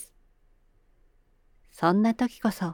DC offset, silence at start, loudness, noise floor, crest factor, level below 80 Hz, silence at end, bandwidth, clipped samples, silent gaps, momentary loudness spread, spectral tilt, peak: under 0.1%; 0 s; -26 LUFS; -62 dBFS; 20 dB; -60 dBFS; 0 s; 18.5 kHz; under 0.1%; none; 8 LU; -6.5 dB/octave; -8 dBFS